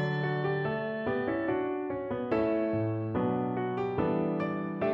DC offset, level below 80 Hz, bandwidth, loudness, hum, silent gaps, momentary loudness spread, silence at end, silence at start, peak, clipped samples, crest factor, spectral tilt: under 0.1%; -60 dBFS; 5.8 kHz; -31 LUFS; none; none; 4 LU; 0 s; 0 s; -16 dBFS; under 0.1%; 14 dB; -9.5 dB/octave